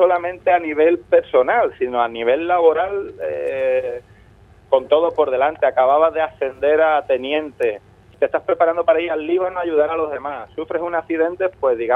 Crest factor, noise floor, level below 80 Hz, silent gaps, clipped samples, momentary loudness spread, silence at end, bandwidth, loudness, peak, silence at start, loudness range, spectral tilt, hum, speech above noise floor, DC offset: 16 dB; -48 dBFS; -54 dBFS; none; under 0.1%; 9 LU; 0 s; 4 kHz; -18 LUFS; -2 dBFS; 0 s; 3 LU; -6.5 dB/octave; none; 30 dB; under 0.1%